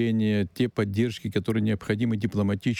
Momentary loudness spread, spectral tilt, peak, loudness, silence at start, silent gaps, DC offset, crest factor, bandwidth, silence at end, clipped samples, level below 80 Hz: 2 LU; -7.5 dB/octave; -12 dBFS; -26 LUFS; 0 s; none; under 0.1%; 14 dB; 14 kHz; 0 s; under 0.1%; -56 dBFS